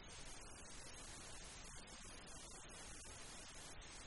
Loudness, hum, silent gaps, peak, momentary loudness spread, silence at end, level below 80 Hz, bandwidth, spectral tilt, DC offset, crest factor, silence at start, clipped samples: -55 LUFS; none; none; -40 dBFS; 1 LU; 0 s; -62 dBFS; 11.5 kHz; -2 dB/octave; under 0.1%; 14 dB; 0 s; under 0.1%